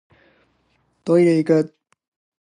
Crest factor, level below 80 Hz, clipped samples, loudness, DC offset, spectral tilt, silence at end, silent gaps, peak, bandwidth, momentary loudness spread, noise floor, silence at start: 16 dB; -70 dBFS; under 0.1%; -18 LUFS; under 0.1%; -8 dB/octave; 0.75 s; none; -4 dBFS; 11 kHz; 15 LU; -65 dBFS; 1.05 s